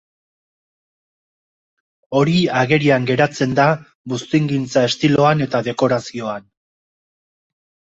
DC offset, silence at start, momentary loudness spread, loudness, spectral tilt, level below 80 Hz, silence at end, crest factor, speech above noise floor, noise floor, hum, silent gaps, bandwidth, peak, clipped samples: under 0.1%; 2.1 s; 12 LU; -17 LUFS; -6 dB/octave; -56 dBFS; 1.55 s; 18 dB; over 73 dB; under -90 dBFS; none; 3.95-4.04 s; 8 kHz; -2 dBFS; under 0.1%